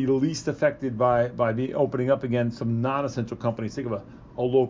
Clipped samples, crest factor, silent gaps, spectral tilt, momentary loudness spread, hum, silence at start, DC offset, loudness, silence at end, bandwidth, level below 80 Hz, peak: under 0.1%; 16 dB; none; -7 dB/octave; 8 LU; none; 0 s; under 0.1%; -26 LUFS; 0 s; 7.6 kHz; -54 dBFS; -8 dBFS